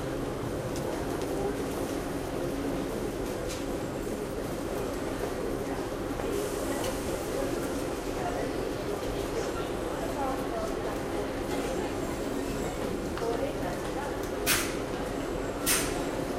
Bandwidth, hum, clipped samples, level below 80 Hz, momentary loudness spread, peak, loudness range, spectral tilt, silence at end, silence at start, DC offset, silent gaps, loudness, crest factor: 16 kHz; none; under 0.1%; -44 dBFS; 3 LU; -12 dBFS; 2 LU; -4.5 dB/octave; 0 s; 0 s; under 0.1%; none; -32 LUFS; 20 dB